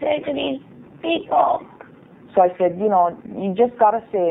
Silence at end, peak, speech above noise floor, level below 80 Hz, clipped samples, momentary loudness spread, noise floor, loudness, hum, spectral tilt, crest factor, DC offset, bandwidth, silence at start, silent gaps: 0 s; -4 dBFS; 26 dB; -62 dBFS; under 0.1%; 10 LU; -45 dBFS; -20 LUFS; none; -9.5 dB/octave; 16 dB; under 0.1%; 3.9 kHz; 0 s; none